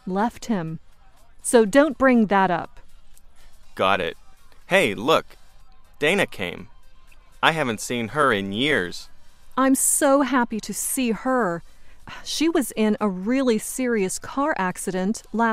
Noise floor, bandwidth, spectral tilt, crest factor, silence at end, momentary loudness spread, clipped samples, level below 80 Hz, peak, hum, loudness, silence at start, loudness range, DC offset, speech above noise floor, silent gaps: -46 dBFS; 16 kHz; -3.5 dB/octave; 22 dB; 0 s; 13 LU; under 0.1%; -48 dBFS; 0 dBFS; none; -22 LUFS; 0.05 s; 3 LU; under 0.1%; 25 dB; none